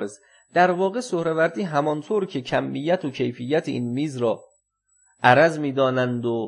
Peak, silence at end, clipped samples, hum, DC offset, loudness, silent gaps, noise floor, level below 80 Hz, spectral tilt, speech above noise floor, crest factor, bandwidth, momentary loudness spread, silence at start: 0 dBFS; 0 s; under 0.1%; none; under 0.1%; -22 LUFS; none; -66 dBFS; -68 dBFS; -6 dB/octave; 44 dB; 22 dB; 11 kHz; 9 LU; 0 s